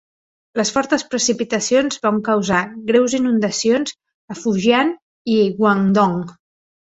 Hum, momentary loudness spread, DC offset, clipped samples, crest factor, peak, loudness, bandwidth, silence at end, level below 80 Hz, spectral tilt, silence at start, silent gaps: none; 10 LU; under 0.1%; under 0.1%; 16 dB; -2 dBFS; -18 LUFS; 8.2 kHz; 0.6 s; -56 dBFS; -4.5 dB/octave; 0.55 s; 4.14-4.28 s, 5.02-5.25 s